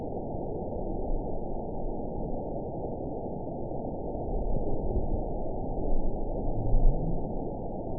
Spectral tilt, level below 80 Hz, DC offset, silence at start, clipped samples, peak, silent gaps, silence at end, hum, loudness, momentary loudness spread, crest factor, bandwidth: -16.5 dB/octave; -32 dBFS; 0.8%; 0 s; under 0.1%; -10 dBFS; none; 0 s; none; -34 LUFS; 5 LU; 18 dB; 1 kHz